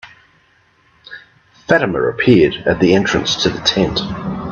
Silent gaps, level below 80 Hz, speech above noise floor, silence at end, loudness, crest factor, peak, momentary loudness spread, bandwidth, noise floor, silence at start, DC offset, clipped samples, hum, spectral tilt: none; -42 dBFS; 40 dB; 0 s; -15 LUFS; 16 dB; 0 dBFS; 22 LU; 7.4 kHz; -55 dBFS; 0.05 s; under 0.1%; under 0.1%; none; -5 dB/octave